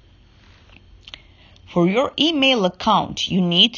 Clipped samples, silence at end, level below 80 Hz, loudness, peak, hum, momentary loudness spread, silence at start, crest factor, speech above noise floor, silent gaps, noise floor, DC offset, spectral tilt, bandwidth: under 0.1%; 0 s; -50 dBFS; -18 LUFS; -2 dBFS; none; 22 LU; 1.7 s; 18 dB; 32 dB; none; -50 dBFS; under 0.1%; -5 dB/octave; 7.2 kHz